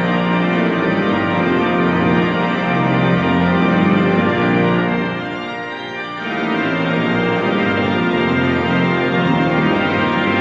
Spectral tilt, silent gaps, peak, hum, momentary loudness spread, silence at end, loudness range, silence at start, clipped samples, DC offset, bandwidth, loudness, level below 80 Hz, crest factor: -7.5 dB/octave; none; -2 dBFS; none; 7 LU; 0 s; 3 LU; 0 s; under 0.1%; under 0.1%; 7.4 kHz; -16 LUFS; -46 dBFS; 14 dB